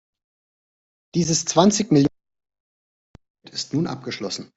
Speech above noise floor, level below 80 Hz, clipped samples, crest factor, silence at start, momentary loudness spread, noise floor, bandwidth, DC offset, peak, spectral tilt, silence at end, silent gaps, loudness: over 70 dB; -58 dBFS; under 0.1%; 20 dB; 1.15 s; 13 LU; under -90 dBFS; 8.2 kHz; under 0.1%; -4 dBFS; -4.5 dB/octave; 0.1 s; 2.60-3.14 s, 3.30-3.35 s; -21 LUFS